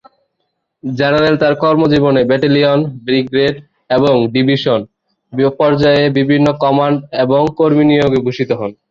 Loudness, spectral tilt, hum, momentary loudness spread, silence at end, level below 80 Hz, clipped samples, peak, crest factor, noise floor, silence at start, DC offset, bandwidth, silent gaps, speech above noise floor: -13 LUFS; -8 dB/octave; none; 7 LU; 0.2 s; -48 dBFS; under 0.1%; 0 dBFS; 12 dB; -70 dBFS; 0.85 s; under 0.1%; 7.4 kHz; none; 58 dB